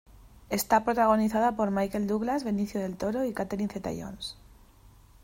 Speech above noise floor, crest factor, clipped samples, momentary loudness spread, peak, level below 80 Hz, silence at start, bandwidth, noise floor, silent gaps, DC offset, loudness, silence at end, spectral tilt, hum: 28 dB; 18 dB; under 0.1%; 13 LU; -10 dBFS; -54 dBFS; 0.2 s; 16 kHz; -55 dBFS; none; under 0.1%; -28 LUFS; 0.35 s; -5.5 dB/octave; none